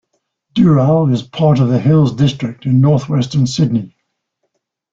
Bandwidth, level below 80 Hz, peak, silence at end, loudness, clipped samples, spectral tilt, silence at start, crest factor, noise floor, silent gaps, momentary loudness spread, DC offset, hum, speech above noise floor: 7.6 kHz; -48 dBFS; -2 dBFS; 1.05 s; -14 LUFS; under 0.1%; -8 dB/octave; 0.55 s; 12 dB; -70 dBFS; none; 7 LU; under 0.1%; none; 58 dB